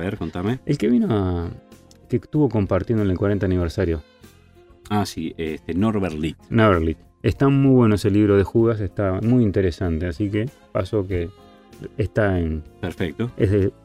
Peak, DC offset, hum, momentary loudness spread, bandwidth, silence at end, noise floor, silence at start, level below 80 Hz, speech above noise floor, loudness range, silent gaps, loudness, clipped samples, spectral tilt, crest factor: -2 dBFS; under 0.1%; none; 11 LU; 13.5 kHz; 0.15 s; -50 dBFS; 0 s; -40 dBFS; 30 dB; 6 LU; none; -21 LUFS; under 0.1%; -8 dB/octave; 18 dB